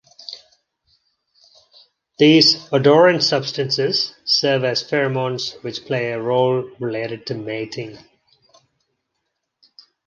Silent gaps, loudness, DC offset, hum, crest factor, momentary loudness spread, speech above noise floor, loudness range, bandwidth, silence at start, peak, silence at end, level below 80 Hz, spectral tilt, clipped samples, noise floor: none; -18 LUFS; under 0.1%; none; 18 dB; 17 LU; 58 dB; 10 LU; 9.4 kHz; 0.3 s; -2 dBFS; 2.1 s; -66 dBFS; -4.5 dB/octave; under 0.1%; -76 dBFS